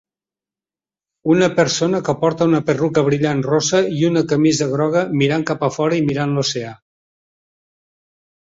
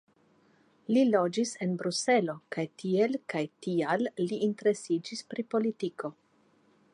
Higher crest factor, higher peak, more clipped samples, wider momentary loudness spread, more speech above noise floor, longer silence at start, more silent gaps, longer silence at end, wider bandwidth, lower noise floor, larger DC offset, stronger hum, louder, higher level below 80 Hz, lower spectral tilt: about the same, 16 dB vs 18 dB; first, -2 dBFS vs -12 dBFS; neither; second, 4 LU vs 10 LU; first, over 73 dB vs 37 dB; first, 1.25 s vs 0.9 s; neither; first, 1.7 s vs 0.8 s; second, 7.8 kHz vs 11.5 kHz; first, under -90 dBFS vs -66 dBFS; neither; neither; first, -17 LUFS vs -30 LUFS; first, -56 dBFS vs -82 dBFS; about the same, -5.5 dB/octave vs -5 dB/octave